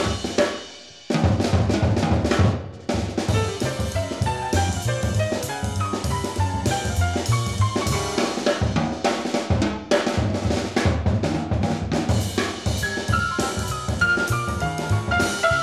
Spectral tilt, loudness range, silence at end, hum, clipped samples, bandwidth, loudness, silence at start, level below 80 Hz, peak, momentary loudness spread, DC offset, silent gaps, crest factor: -5 dB/octave; 2 LU; 0 s; none; under 0.1%; 14.5 kHz; -23 LUFS; 0 s; -34 dBFS; -6 dBFS; 5 LU; 0.1%; none; 16 dB